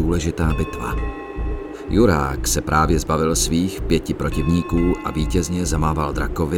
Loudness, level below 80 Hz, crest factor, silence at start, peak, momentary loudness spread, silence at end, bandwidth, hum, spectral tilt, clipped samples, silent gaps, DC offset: -21 LUFS; -26 dBFS; 16 dB; 0 s; -4 dBFS; 9 LU; 0 s; 17.5 kHz; none; -5.5 dB/octave; under 0.1%; none; under 0.1%